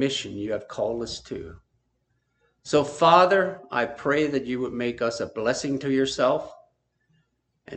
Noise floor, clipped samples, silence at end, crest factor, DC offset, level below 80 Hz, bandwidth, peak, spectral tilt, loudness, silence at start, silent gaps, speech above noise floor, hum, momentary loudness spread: -73 dBFS; under 0.1%; 0 s; 24 dB; under 0.1%; -58 dBFS; 9 kHz; -2 dBFS; -4.5 dB/octave; -24 LUFS; 0 s; none; 49 dB; none; 16 LU